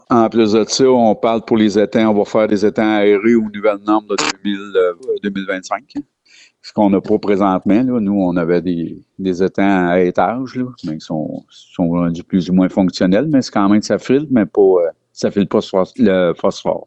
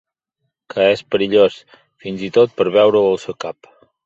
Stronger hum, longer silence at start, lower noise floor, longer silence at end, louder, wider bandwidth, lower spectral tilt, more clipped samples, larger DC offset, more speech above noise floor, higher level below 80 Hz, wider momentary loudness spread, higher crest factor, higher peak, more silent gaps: neither; second, 0.1 s vs 0.75 s; second, -48 dBFS vs -74 dBFS; second, 0.05 s vs 0.55 s; about the same, -15 LUFS vs -15 LUFS; about the same, 8.4 kHz vs 8 kHz; about the same, -6 dB/octave vs -5.5 dB/octave; neither; neither; second, 33 dB vs 59 dB; first, -52 dBFS vs -58 dBFS; second, 10 LU vs 16 LU; about the same, 12 dB vs 16 dB; about the same, -2 dBFS vs -2 dBFS; neither